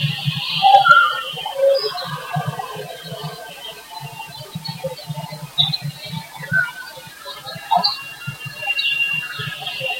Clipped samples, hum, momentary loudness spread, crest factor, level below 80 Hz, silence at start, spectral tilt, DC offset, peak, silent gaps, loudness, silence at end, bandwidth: under 0.1%; none; 19 LU; 20 dB; -60 dBFS; 0 s; -4 dB/octave; under 0.1%; 0 dBFS; none; -18 LUFS; 0 s; 16.5 kHz